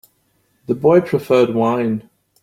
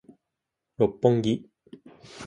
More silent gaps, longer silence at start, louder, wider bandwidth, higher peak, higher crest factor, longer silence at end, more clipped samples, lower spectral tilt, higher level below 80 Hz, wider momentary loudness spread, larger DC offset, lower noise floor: neither; about the same, 0.7 s vs 0.8 s; first, -16 LUFS vs -25 LUFS; first, 15.5 kHz vs 10.5 kHz; first, -2 dBFS vs -6 dBFS; second, 16 dB vs 22 dB; first, 0.4 s vs 0 s; neither; about the same, -8 dB/octave vs -7.5 dB/octave; about the same, -58 dBFS vs -60 dBFS; about the same, 10 LU vs 11 LU; neither; second, -63 dBFS vs -84 dBFS